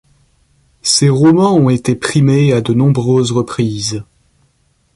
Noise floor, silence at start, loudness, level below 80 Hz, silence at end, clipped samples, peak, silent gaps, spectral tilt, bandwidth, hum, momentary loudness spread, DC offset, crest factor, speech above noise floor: -58 dBFS; 0.85 s; -12 LUFS; -46 dBFS; 0.95 s; under 0.1%; 0 dBFS; none; -5.5 dB/octave; 11.5 kHz; none; 10 LU; under 0.1%; 14 dB; 46 dB